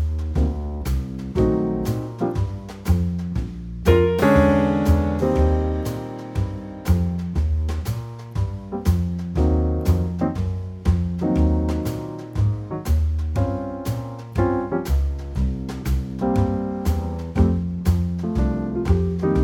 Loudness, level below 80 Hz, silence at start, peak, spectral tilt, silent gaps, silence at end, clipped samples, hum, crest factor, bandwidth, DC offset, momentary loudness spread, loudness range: -23 LUFS; -26 dBFS; 0 s; -4 dBFS; -8 dB/octave; none; 0 s; under 0.1%; none; 18 dB; 17 kHz; under 0.1%; 9 LU; 5 LU